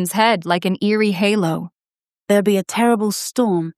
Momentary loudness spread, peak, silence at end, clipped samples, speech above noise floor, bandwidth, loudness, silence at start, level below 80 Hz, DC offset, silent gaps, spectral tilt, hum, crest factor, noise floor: 5 LU; -2 dBFS; 0.05 s; under 0.1%; over 73 dB; 15 kHz; -18 LUFS; 0 s; -68 dBFS; under 0.1%; none; -5 dB/octave; none; 16 dB; under -90 dBFS